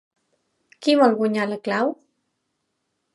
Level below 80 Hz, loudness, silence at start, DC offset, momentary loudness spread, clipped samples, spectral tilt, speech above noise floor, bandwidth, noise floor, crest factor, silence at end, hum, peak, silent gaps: -80 dBFS; -21 LUFS; 0.8 s; under 0.1%; 9 LU; under 0.1%; -5.5 dB/octave; 56 dB; 11.5 kHz; -76 dBFS; 20 dB; 1.2 s; none; -4 dBFS; none